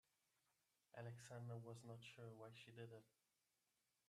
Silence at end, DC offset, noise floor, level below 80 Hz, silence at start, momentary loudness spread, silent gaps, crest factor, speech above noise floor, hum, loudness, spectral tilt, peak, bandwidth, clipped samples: 1 s; under 0.1%; -90 dBFS; under -90 dBFS; 0.95 s; 6 LU; none; 18 dB; 31 dB; none; -59 LUFS; -5.5 dB/octave; -42 dBFS; 13.5 kHz; under 0.1%